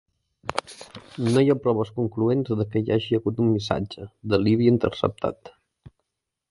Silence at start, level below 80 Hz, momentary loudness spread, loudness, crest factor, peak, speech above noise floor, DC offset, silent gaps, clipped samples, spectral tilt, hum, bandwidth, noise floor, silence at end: 0.45 s; -52 dBFS; 16 LU; -24 LUFS; 20 dB; -4 dBFS; 59 dB; under 0.1%; none; under 0.1%; -7.5 dB/octave; none; 11.5 kHz; -82 dBFS; 1 s